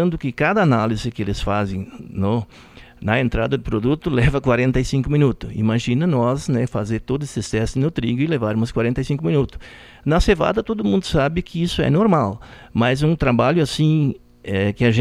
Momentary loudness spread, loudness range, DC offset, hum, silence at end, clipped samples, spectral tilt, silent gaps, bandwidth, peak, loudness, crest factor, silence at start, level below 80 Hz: 8 LU; 3 LU; under 0.1%; none; 0 s; under 0.1%; -7 dB/octave; none; 13 kHz; -2 dBFS; -20 LUFS; 18 dB; 0 s; -34 dBFS